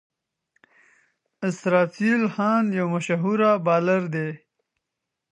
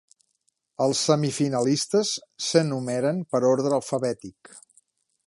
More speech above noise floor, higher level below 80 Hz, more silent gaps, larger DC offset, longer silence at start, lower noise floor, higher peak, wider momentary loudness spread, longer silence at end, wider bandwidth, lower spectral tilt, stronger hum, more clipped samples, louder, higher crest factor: first, 62 dB vs 50 dB; about the same, -74 dBFS vs -70 dBFS; neither; neither; first, 1.4 s vs 0.8 s; first, -83 dBFS vs -73 dBFS; about the same, -4 dBFS vs -6 dBFS; about the same, 9 LU vs 7 LU; first, 0.95 s vs 0.7 s; second, 9.4 kHz vs 11.5 kHz; first, -7 dB/octave vs -4.5 dB/octave; neither; neither; about the same, -22 LUFS vs -24 LUFS; about the same, 20 dB vs 20 dB